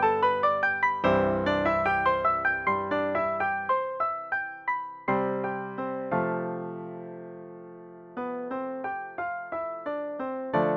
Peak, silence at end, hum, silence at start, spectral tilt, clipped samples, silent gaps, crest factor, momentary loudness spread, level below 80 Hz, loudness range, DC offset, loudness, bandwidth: -12 dBFS; 0 s; none; 0 s; -7.5 dB/octave; under 0.1%; none; 16 dB; 15 LU; -58 dBFS; 10 LU; under 0.1%; -28 LUFS; 7 kHz